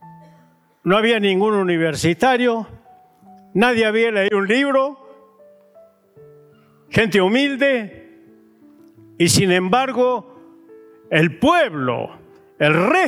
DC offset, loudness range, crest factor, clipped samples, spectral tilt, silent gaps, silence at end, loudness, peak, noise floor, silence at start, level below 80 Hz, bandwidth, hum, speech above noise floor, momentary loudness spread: under 0.1%; 3 LU; 16 dB; under 0.1%; -4.5 dB/octave; none; 0 s; -17 LUFS; -4 dBFS; -54 dBFS; 0.05 s; -56 dBFS; 16.5 kHz; none; 37 dB; 10 LU